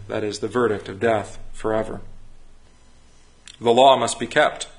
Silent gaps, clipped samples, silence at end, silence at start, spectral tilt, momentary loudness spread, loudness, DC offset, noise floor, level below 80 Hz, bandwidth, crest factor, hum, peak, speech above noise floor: none; under 0.1%; 0.1 s; 0 s; -4 dB/octave; 15 LU; -20 LUFS; under 0.1%; -49 dBFS; -46 dBFS; 11 kHz; 22 dB; none; 0 dBFS; 29 dB